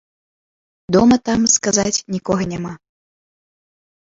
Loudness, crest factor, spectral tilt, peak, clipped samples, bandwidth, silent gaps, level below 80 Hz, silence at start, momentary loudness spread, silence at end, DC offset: -16 LUFS; 18 dB; -4 dB/octave; -2 dBFS; under 0.1%; 7.8 kHz; none; -48 dBFS; 0.9 s; 11 LU; 1.35 s; under 0.1%